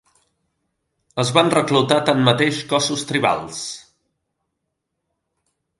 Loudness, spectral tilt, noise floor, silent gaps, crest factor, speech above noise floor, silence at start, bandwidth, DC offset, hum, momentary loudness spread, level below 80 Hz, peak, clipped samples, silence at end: -18 LUFS; -4.5 dB/octave; -77 dBFS; none; 20 dB; 59 dB; 1.15 s; 11.5 kHz; under 0.1%; none; 14 LU; -62 dBFS; 0 dBFS; under 0.1%; 2 s